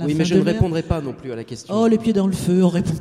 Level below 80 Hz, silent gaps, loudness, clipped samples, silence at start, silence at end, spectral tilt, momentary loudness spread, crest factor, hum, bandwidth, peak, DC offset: -40 dBFS; none; -19 LUFS; under 0.1%; 0 s; 0 s; -7 dB/octave; 13 LU; 16 dB; none; 13.5 kHz; -2 dBFS; under 0.1%